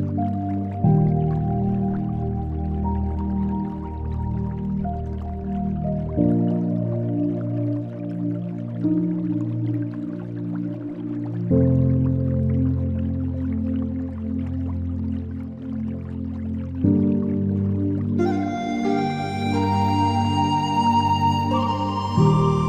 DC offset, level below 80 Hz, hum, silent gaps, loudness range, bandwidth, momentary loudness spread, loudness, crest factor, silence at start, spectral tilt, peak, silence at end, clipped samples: under 0.1%; -40 dBFS; none; none; 5 LU; 9 kHz; 10 LU; -23 LUFS; 16 dB; 0 s; -8.5 dB/octave; -6 dBFS; 0 s; under 0.1%